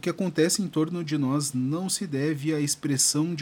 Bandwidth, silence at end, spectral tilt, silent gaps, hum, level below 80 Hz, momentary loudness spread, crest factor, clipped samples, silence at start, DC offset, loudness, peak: 17 kHz; 0 s; -4 dB/octave; none; none; -70 dBFS; 6 LU; 16 dB; under 0.1%; 0.05 s; under 0.1%; -25 LUFS; -10 dBFS